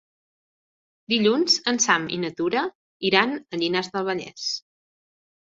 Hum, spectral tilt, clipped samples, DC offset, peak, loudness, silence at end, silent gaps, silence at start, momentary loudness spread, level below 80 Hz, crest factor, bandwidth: none; -2.5 dB/octave; under 0.1%; under 0.1%; -2 dBFS; -23 LUFS; 1 s; 2.75-3.00 s; 1.1 s; 9 LU; -68 dBFS; 22 dB; 8 kHz